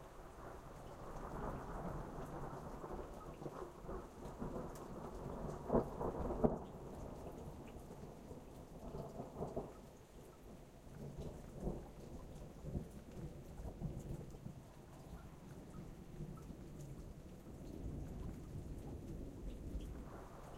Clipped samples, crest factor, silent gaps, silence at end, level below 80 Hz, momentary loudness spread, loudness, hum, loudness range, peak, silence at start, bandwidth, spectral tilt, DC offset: under 0.1%; 32 dB; none; 0 s; -54 dBFS; 11 LU; -49 LUFS; none; 9 LU; -16 dBFS; 0 s; 16 kHz; -7.5 dB/octave; under 0.1%